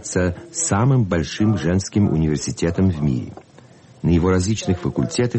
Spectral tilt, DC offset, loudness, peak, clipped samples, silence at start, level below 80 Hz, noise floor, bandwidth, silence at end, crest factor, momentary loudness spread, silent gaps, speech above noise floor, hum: -6 dB/octave; under 0.1%; -20 LUFS; -8 dBFS; under 0.1%; 0 s; -38 dBFS; -46 dBFS; 8.8 kHz; 0 s; 12 dB; 6 LU; none; 28 dB; none